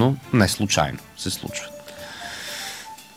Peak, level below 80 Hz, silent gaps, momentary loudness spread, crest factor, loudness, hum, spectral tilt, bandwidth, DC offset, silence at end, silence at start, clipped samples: -4 dBFS; -48 dBFS; none; 17 LU; 20 dB; -24 LUFS; none; -4.5 dB/octave; over 20 kHz; under 0.1%; 0 s; 0 s; under 0.1%